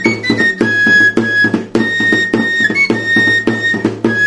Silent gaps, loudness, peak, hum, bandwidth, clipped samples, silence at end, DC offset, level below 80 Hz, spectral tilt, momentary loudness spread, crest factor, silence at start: none; -11 LUFS; 0 dBFS; none; 11.5 kHz; under 0.1%; 0 s; under 0.1%; -50 dBFS; -4.5 dB/octave; 6 LU; 12 dB; 0 s